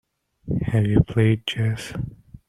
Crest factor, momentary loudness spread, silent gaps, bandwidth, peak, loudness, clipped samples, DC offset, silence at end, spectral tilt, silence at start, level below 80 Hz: 18 dB; 13 LU; none; 12 kHz; -4 dBFS; -22 LUFS; under 0.1%; under 0.1%; 0.1 s; -7 dB/octave; 0.45 s; -40 dBFS